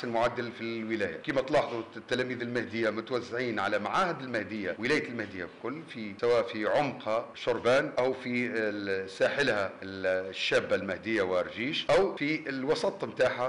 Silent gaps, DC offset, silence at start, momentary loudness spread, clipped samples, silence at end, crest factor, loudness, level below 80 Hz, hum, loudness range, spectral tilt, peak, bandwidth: none; under 0.1%; 0 s; 9 LU; under 0.1%; 0 s; 12 dB; -30 LUFS; -64 dBFS; none; 2 LU; -5 dB/octave; -18 dBFS; 11.5 kHz